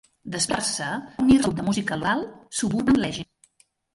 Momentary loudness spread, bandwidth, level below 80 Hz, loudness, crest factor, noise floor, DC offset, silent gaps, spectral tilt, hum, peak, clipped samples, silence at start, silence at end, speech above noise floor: 12 LU; 11.5 kHz; -48 dBFS; -24 LUFS; 18 dB; -63 dBFS; under 0.1%; none; -4 dB/octave; none; -8 dBFS; under 0.1%; 0.25 s; 0.7 s; 40 dB